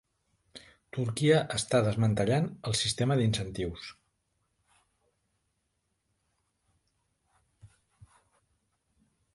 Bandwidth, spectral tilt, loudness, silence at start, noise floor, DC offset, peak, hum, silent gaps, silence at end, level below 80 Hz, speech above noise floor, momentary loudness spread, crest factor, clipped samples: 11.5 kHz; -5 dB/octave; -29 LUFS; 0.55 s; -79 dBFS; under 0.1%; -12 dBFS; none; none; 1.7 s; -58 dBFS; 51 dB; 12 LU; 22 dB; under 0.1%